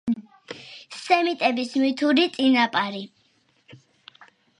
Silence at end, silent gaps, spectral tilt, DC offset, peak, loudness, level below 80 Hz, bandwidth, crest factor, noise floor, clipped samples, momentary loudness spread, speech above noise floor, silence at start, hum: 0.85 s; none; -4 dB/octave; under 0.1%; -6 dBFS; -22 LUFS; -70 dBFS; 11 kHz; 18 dB; -64 dBFS; under 0.1%; 19 LU; 43 dB; 0.05 s; none